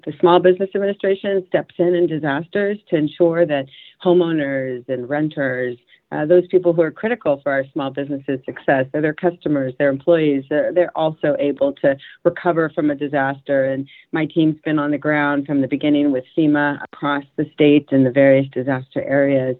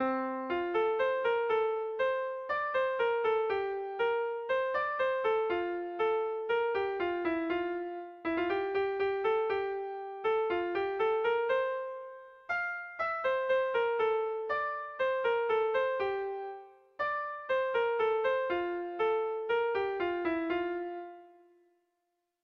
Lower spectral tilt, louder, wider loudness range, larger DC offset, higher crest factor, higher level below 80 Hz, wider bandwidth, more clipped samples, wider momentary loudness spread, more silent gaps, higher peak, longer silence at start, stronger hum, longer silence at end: first, -10 dB/octave vs -6 dB/octave; first, -18 LUFS vs -32 LUFS; about the same, 3 LU vs 2 LU; neither; first, 18 dB vs 12 dB; first, -64 dBFS vs -70 dBFS; second, 4.2 kHz vs 6.2 kHz; neither; about the same, 9 LU vs 7 LU; neither; first, 0 dBFS vs -20 dBFS; about the same, 0.05 s vs 0 s; neither; second, 0.05 s vs 1.15 s